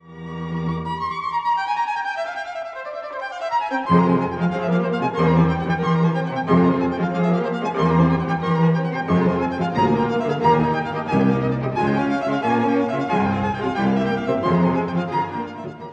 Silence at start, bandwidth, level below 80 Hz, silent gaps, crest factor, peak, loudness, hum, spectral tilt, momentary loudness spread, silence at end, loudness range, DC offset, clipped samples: 0.05 s; 7.6 kHz; -48 dBFS; none; 16 dB; -4 dBFS; -21 LUFS; none; -8 dB/octave; 10 LU; 0 s; 3 LU; under 0.1%; under 0.1%